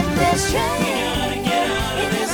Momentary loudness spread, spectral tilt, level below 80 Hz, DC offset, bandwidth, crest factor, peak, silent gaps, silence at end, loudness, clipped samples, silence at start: 3 LU; -4 dB/octave; -34 dBFS; under 0.1%; over 20 kHz; 14 dB; -4 dBFS; none; 0 s; -20 LUFS; under 0.1%; 0 s